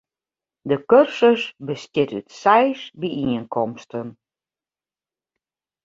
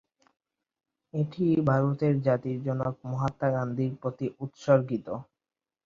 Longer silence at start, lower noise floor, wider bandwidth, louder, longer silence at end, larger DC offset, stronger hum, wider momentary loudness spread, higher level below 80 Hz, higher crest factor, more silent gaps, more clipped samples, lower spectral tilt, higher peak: second, 0.65 s vs 1.15 s; about the same, under -90 dBFS vs under -90 dBFS; about the same, 7.6 kHz vs 7.4 kHz; first, -20 LUFS vs -28 LUFS; first, 1.75 s vs 0.65 s; neither; neither; first, 16 LU vs 10 LU; about the same, -62 dBFS vs -62 dBFS; about the same, 20 dB vs 20 dB; neither; neither; second, -6 dB/octave vs -9.5 dB/octave; first, -2 dBFS vs -8 dBFS